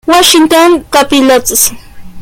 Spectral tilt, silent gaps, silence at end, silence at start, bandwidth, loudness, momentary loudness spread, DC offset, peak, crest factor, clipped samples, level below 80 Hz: -1.5 dB/octave; none; 0 s; 0.05 s; over 20 kHz; -6 LUFS; 4 LU; under 0.1%; 0 dBFS; 8 dB; 0.6%; -36 dBFS